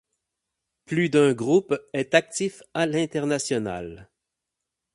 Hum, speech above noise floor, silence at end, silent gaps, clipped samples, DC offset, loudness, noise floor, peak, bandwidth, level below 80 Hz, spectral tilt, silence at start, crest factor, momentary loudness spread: none; 61 dB; 0.9 s; none; under 0.1%; under 0.1%; -24 LUFS; -84 dBFS; -2 dBFS; 11.5 kHz; -60 dBFS; -5 dB/octave; 0.9 s; 22 dB; 9 LU